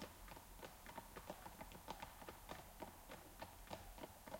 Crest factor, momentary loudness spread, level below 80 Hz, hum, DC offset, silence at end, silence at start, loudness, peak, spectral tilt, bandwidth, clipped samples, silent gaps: 22 dB; 4 LU; -66 dBFS; none; under 0.1%; 0 s; 0 s; -56 LUFS; -34 dBFS; -3.5 dB/octave; 16.5 kHz; under 0.1%; none